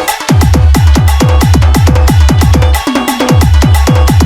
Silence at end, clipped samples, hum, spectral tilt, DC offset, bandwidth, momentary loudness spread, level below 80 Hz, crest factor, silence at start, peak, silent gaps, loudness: 0 s; 1%; none; -6 dB/octave; under 0.1%; 17 kHz; 3 LU; -10 dBFS; 6 dB; 0 s; 0 dBFS; none; -8 LUFS